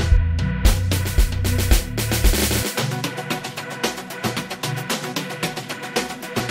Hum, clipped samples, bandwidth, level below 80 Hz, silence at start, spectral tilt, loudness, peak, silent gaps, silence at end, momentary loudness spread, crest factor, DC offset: none; under 0.1%; 16.5 kHz; -24 dBFS; 0 s; -4 dB/octave; -22 LUFS; -2 dBFS; none; 0 s; 7 LU; 18 dB; under 0.1%